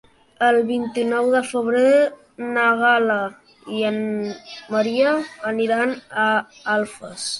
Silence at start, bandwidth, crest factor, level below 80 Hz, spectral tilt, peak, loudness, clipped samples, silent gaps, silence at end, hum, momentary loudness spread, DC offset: 0.4 s; 11.5 kHz; 16 dB; -66 dBFS; -4 dB/octave; -6 dBFS; -20 LUFS; under 0.1%; none; 0 s; none; 12 LU; under 0.1%